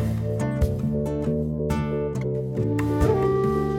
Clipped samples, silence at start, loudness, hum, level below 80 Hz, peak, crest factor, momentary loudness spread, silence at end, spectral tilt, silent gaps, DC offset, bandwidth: under 0.1%; 0 s; -24 LUFS; none; -34 dBFS; -8 dBFS; 14 dB; 5 LU; 0 s; -8.5 dB/octave; none; under 0.1%; 16.5 kHz